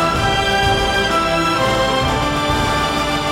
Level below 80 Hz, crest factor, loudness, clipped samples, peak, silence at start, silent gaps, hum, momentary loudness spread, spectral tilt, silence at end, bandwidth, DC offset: -30 dBFS; 12 dB; -16 LUFS; under 0.1%; -4 dBFS; 0 s; none; none; 2 LU; -4 dB/octave; 0 s; 18.5 kHz; under 0.1%